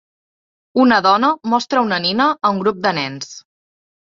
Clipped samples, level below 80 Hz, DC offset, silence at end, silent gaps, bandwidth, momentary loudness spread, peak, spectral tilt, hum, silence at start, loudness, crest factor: under 0.1%; -60 dBFS; under 0.1%; 0.75 s; none; 7.6 kHz; 11 LU; -2 dBFS; -4.5 dB/octave; none; 0.75 s; -16 LUFS; 16 dB